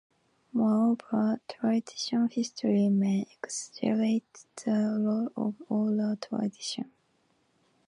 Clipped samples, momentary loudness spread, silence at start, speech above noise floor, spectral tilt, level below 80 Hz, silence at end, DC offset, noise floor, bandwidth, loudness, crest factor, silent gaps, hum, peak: under 0.1%; 10 LU; 0.55 s; 42 dB; -6 dB/octave; -76 dBFS; 1 s; under 0.1%; -71 dBFS; 11 kHz; -29 LUFS; 16 dB; none; none; -14 dBFS